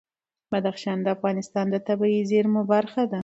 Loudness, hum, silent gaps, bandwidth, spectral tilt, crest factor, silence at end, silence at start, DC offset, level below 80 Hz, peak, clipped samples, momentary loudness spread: -24 LUFS; none; none; 8 kHz; -7 dB/octave; 16 dB; 0 s; 0.5 s; under 0.1%; -70 dBFS; -8 dBFS; under 0.1%; 6 LU